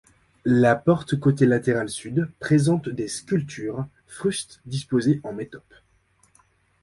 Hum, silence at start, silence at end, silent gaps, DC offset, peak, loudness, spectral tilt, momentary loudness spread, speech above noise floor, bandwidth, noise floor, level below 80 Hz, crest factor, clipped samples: none; 0.45 s; 1.25 s; none; under 0.1%; -6 dBFS; -23 LUFS; -6.5 dB/octave; 13 LU; 40 dB; 11.5 kHz; -63 dBFS; -56 dBFS; 18 dB; under 0.1%